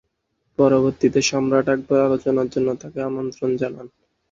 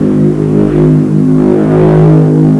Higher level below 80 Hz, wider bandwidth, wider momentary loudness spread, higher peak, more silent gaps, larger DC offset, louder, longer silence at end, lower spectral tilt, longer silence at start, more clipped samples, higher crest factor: second, -56 dBFS vs -30 dBFS; first, 7.8 kHz vs 4.5 kHz; first, 10 LU vs 4 LU; about the same, -2 dBFS vs 0 dBFS; neither; neither; second, -20 LUFS vs -7 LUFS; first, 0.45 s vs 0 s; second, -5.5 dB/octave vs -10.5 dB/octave; first, 0.6 s vs 0 s; neither; first, 18 dB vs 6 dB